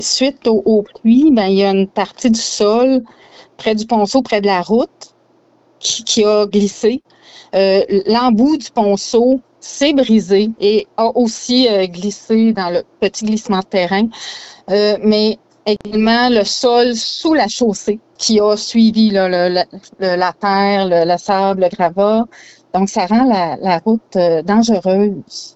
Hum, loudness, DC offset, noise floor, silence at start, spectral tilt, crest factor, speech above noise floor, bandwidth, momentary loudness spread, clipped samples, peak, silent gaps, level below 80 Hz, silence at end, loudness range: none; -14 LUFS; under 0.1%; -53 dBFS; 0 s; -4.5 dB/octave; 12 dB; 39 dB; 8.2 kHz; 7 LU; under 0.1%; -2 dBFS; none; -50 dBFS; 0.05 s; 3 LU